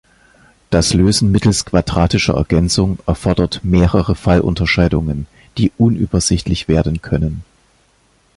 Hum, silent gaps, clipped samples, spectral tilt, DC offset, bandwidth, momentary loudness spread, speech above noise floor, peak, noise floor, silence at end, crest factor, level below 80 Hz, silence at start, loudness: none; none; under 0.1%; -5.5 dB/octave; under 0.1%; 11.5 kHz; 6 LU; 41 dB; 0 dBFS; -55 dBFS; 0.95 s; 14 dB; -26 dBFS; 0.7 s; -15 LUFS